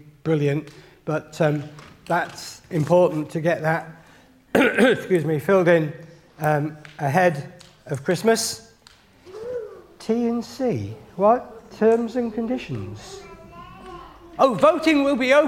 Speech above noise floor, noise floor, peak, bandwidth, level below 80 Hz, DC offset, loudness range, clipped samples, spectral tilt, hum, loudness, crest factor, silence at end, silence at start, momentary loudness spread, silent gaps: 32 dB; -53 dBFS; -2 dBFS; 16.5 kHz; -58 dBFS; under 0.1%; 5 LU; under 0.1%; -5.5 dB/octave; none; -22 LUFS; 20 dB; 0 s; 0.25 s; 23 LU; none